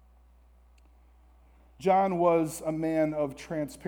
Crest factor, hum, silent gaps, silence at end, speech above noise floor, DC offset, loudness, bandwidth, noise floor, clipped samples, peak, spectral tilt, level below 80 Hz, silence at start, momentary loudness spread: 18 dB; none; none; 0 s; 31 dB; under 0.1%; -28 LUFS; 19.5 kHz; -58 dBFS; under 0.1%; -12 dBFS; -6.5 dB/octave; -58 dBFS; 1.8 s; 9 LU